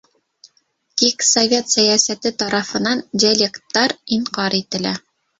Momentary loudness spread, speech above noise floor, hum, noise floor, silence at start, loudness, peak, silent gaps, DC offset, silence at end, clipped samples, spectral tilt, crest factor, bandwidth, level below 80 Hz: 9 LU; 45 dB; none; -63 dBFS; 0.95 s; -17 LUFS; 0 dBFS; none; under 0.1%; 0.4 s; under 0.1%; -2 dB/octave; 18 dB; 8.2 kHz; -60 dBFS